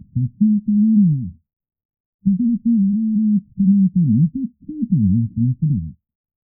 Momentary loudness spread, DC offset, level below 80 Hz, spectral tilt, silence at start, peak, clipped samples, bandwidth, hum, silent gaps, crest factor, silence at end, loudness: 9 LU; under 0.1%; -48 dBFS; -28 dB/octave; 0.15 s; -6 dBFS; under 0.1%; 0.4 kHz; none; 1.85-1.89 s, 2.00-2.19 s; 12 dB; 0.55 s; -18 LUFS